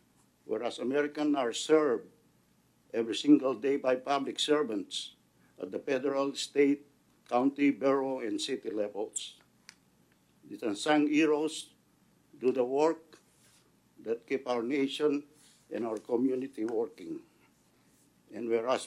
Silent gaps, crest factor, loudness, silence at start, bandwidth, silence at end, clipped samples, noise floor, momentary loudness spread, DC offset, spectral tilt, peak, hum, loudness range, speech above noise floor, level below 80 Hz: none; 20 dB; -31 LUFS; 0.5 s; 12.5 kHz; 0 s; under 0.1%; -68 dBFS; 14 LU; under 0.1%; -4 dB/octave; -12 dBFS; none; 5 LU; 38 dB; -82 dBFS